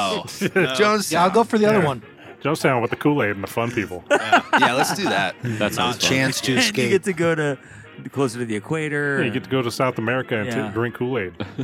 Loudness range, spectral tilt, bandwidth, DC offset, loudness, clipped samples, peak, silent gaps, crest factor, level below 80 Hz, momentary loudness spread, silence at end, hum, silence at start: 4 LU; -4.5 dB/octave; 16.5 kHz; under 0.1%; -20 LUFS; under 0.1%; -2 dBFS; none; 18 dB; -60 dBFS; 8 LU; 0 s; none; 0 s